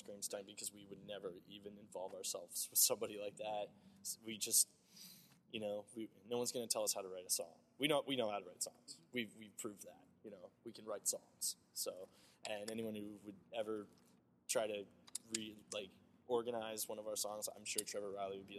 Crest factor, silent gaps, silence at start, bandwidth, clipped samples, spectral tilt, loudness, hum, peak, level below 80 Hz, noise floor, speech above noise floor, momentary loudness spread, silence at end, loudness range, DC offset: 28 dB; none; 0 s; 13.5 kHz; under 0.1%; -1.5 dB/octave; -42 LUFS; none; -18 dBFS; -88 dBFS; -63 dBFS; 19 dB; 18 LU; 0 s; 7 LU; under 0.1%